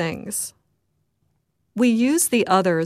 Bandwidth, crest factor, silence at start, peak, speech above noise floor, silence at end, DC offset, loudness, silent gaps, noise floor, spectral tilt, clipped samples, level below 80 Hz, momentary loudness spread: 15.5 kHz; 16 dB; 0 s; -6 dBFS; 51 dB; 0 s; under 0.1%; -20 LUFS; none; -71 dBFS; -4 dB/octave; under 0.1%; -64 dBFS; 12 LU